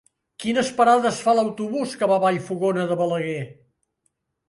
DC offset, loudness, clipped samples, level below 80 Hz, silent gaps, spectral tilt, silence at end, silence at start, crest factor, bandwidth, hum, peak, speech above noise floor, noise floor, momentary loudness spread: under 0.1%; -22 LUFS; under 0.1%; -66 dBFS; none; -5 dB/octave; 1 s; 0.4 s; 18 dB; 11.5 kHz; none; -4 dBFS; 52 dB; -73 dBFS; 11 LU